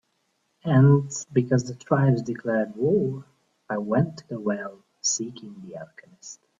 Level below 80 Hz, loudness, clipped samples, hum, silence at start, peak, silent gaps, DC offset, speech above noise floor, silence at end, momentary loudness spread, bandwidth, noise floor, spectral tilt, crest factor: -64 dBFS; -24 LUFS; under 0.1%; none; 0.65 s; -6 dBFS; none; under 0.1%; 48 dB; 0.25 s; 21 LU; 7.6 kHz; -72 dBFS; -6 dB/octave; 18 dB